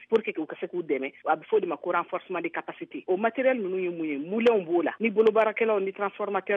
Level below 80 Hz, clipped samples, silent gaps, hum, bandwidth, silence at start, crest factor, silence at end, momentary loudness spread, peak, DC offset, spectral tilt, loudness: -84 dBFS; under 0.1%; none; none; 5.6 kHz; 0 s; 16 dB; 0 s; 10 LU; -12 dBFS; under 0.1%; -7.5 dB/octave; -27 LUFS